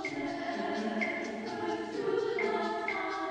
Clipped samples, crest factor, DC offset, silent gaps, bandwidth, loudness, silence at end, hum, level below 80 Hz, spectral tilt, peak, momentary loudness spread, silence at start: under 0.1%; 14 dB; under 0.1%; none; 9.8 kHz; -34 LUFS; 0 s; 60 Hz at -55 dBFS; -70 dBFS; -5 dB/octave; -20 dBFS; 4 LU; 0 s